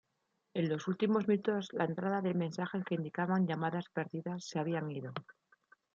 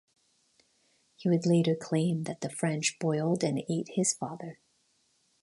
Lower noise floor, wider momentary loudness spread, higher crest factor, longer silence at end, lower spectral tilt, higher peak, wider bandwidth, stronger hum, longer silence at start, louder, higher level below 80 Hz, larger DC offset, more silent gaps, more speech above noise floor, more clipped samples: first, -82 dBFS vs -71 dBFS; about the same, 9 LU vs 10 LU; about the same, 18 dB vs 18 dB; second, 0.65 s vs 0.9 s; first, -7 dB/octave vs -5 dB/octave; second, -18 dBFS vs -12 dBFS; second, 7.6 kHz vs 11.5 kHz; neither; second, 0.55 s vs 1.2 s; second, -36 LUFS vs -30 LUFS; second, -80 dBFS vs -74 dBFS; neither; neither; first, 47 dB vs 42 dB; neither